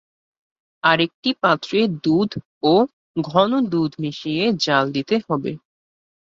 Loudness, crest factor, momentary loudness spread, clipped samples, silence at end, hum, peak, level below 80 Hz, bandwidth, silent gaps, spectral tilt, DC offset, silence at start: -20 LUFS; 20 dB; 8 LU; under 0.1%; 0.8 s; none; -2 dBFS; -60 dBFS; 7.6 kHz; 1.14-1.23 s, 2.45-2.61 s, 2.93-3.14 s; -6 dB/octave; under 0.1%; 0.85 s